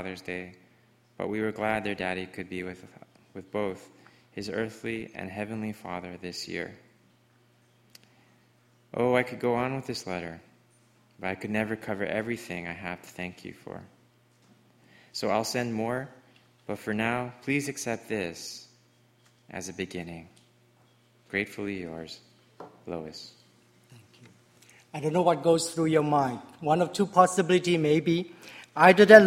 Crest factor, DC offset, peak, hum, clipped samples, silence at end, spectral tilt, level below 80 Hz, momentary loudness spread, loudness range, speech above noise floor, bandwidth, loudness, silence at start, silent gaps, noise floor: 28 dB; under 0.1%; 0 dBFS; none; under 0.1%; 0 s; -5 dB/octave; -66 dBFS; 20 LU; 13 LU; 36 dB; 16 kHz; -28 LUFS; 0 s; none; -63 dBFS